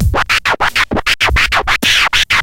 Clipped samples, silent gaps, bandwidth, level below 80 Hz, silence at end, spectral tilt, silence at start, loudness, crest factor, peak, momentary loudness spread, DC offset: under 0.1%; none; 17 kHz; -24 dBFS; 0 s; -2.5 dB/octave; 0 s; -11 LUFS; 12 dB; 0 dBFS; 3 LU; under 0.1%